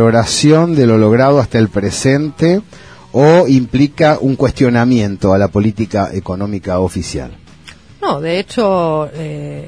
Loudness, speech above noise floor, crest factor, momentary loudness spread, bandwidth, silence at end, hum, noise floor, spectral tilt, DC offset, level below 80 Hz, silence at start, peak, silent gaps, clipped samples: -13 LUFS; 27 dB; 12 dB; 11 LU; 11 kHz; 0 s; none; -39 dBFS; -6 dB/octave; 0.4%; -38 dBFS; 0 s; 0 dBFS; none; under 0.1%